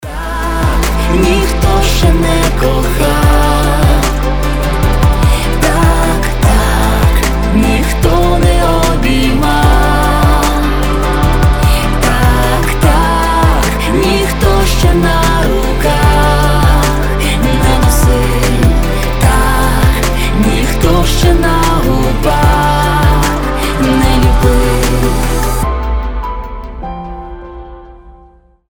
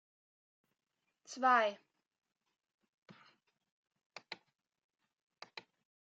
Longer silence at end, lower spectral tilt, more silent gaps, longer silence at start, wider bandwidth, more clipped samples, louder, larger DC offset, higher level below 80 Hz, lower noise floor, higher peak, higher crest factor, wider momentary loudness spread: second, 0 s vs 1.7 s; first, -5.5 dB/octave vs 0 dB/octave; second, none vs 2.74-2.78 s, 2.89-3.02 s, 3.71-3.83 s, 4.06-4.10 s; second, 0 s vs 1.3 s; first, over 20 kHz vs 7.4 kHz; neither; first, -11 LUFS vs -32 LUFS; first, 3% vs under 0.1%; first, -12 dBFS vs under -90 dBFS; second, -43 dBFS vs -72 dBFS; first, 0 dBFS vs -16 dBFS; second, 10 dB vs 26 dB; second, 5 LU vs 27 LU